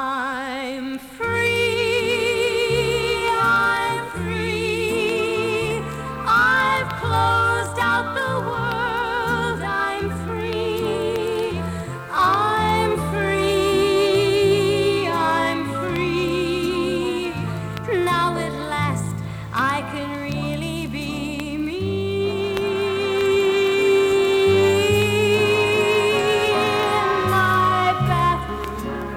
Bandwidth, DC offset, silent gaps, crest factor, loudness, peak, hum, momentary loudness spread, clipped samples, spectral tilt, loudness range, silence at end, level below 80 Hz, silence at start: 16.5 kHz; under 0.1%; none; 14 dB; -20 LUFS; -6 dBFS; none; 9 LU; under 0.1%; -5 dB/octave; 6 LU; 0 s; -42 dBFS; 0 s